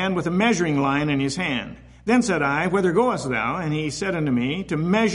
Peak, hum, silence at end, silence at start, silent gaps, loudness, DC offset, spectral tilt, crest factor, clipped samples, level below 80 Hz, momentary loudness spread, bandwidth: -6 dBFS; none; 0 s; 0 s; none; -22 LUFS; under 0.1%; -5.5 dB/octave; 14 dB; under 0.1%; -50 dBFS; 6 LU; 11.5 kHz